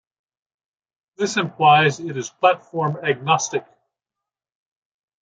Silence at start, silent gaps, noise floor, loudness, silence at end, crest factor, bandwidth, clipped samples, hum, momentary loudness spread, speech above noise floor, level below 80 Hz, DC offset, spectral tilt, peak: 1.2 s; none; -87 dBFS; -20 LUFS; 1.6 s; 20 dB; 9.2 kHz; under 0.1%; none; 13 LU; 68 dB; -70 dBFS; under 0.1%; -4 dB/octave; -2 dBFS